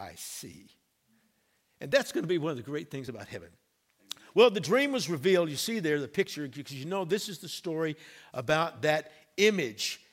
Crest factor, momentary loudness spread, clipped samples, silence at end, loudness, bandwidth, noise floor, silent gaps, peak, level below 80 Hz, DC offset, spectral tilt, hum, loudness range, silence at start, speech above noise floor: 24 dB; 17 LU; under 0.1%; 0.15 s; -29 LUFS; 16.5 kHz; -73 dBFS; none; -8 dBFS; -72 dBFS; under 0.1%; -4 dB/octave; none; 6 LU; 0 s; 43 dB